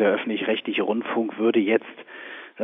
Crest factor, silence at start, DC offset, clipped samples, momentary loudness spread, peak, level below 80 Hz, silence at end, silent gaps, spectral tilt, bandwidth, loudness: 18 dB; 0 s; under 0.1%; under 0.1%; 17 LU; -6 dBFS; -78 dBFS; 0 s; none; -8.5 dB/octave; 3.9 kHz; -24 LUFS